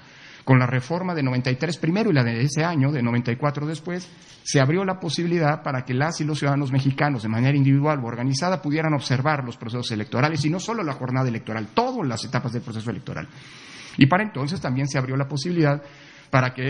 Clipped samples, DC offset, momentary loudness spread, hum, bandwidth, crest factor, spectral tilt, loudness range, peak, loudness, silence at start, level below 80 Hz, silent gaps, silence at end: under 0.1%; under 0.1%; 11 LU; none; 10.5 kHz; 22 dB; -6 dB/octave; 3 LU; -2 dBFS; -23 LUFS; 0.15 s; -60 dBFS; none; 0 s